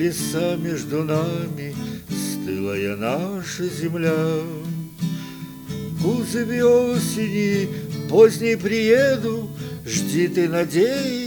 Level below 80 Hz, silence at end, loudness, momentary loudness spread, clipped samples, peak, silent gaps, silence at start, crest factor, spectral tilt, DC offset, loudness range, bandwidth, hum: -54 dBFS; 0 s; -22 LUFS; 13 LU; under 0.1%; -2 dBFS; none; 0 s; 18 dB; -5.5 dB/octave; under 0.1%; 7 LU; 19.5 kHz; none